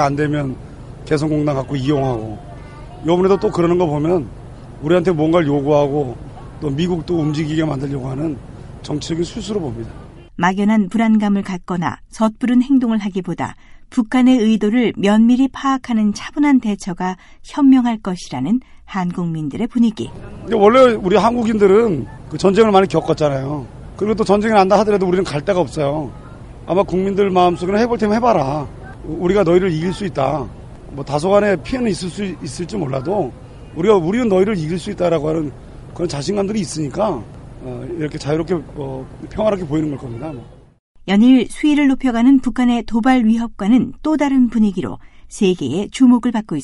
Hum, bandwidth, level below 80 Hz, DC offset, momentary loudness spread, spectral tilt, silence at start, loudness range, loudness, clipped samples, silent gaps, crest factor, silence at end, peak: none; 11.5 kHz; -40 dBFS; under 0.1%; 17 LU; -7 dB/octave; 0 s; 7 LU; -17 LUFS; under 0.1%; 40.79-40.95 s; 16 dB; 0 s; 0 dBFS